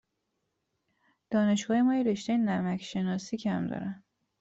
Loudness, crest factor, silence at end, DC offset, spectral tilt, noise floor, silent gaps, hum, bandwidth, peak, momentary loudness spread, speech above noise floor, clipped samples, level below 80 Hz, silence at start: -29 LUFS; 14 dB; 0.45 s; under 0.1%; -6 dB/octave; -81 dBFS; none; none; 8 kHz; -16 dBFS; 9 LU; 52 dB; under 0.1%; -70 dBFS; 1.3 s